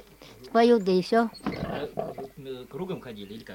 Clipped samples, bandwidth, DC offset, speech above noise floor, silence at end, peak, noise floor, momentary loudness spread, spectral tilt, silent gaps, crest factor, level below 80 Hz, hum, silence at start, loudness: under 0.1%; 17 kHz; under 0.1%; 23 dB; 0 s; -8 dBFS; -49 dBFS; 19 LU; -6.5 dB/octave; none; 18 dB; -56 dBFS; none; 0.2 s; -26 LUFS